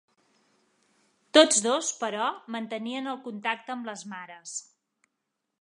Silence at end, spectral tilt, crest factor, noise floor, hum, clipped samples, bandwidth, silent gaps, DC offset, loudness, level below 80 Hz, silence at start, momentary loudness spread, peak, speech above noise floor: 1 s; -1.5 dB/octave; 26 dB; -82 dBFS; none; under 0.1%; 11 kHz; none; under 0.1%; -26 LUFS; -88 dBFS; 1.35 s; 19 LU; -4 dBFS; 55 dB